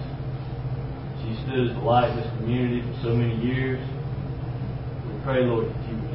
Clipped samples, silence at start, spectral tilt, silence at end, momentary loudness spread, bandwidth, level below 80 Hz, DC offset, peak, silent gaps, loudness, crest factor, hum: under 0.1%; 0 s; -12 dB/octave; 0 s; 10 LU; 5.6 kHz; -40 dBFS; under 0.1%; -8 dBFS; none; -27 LUFS; 16 dB; none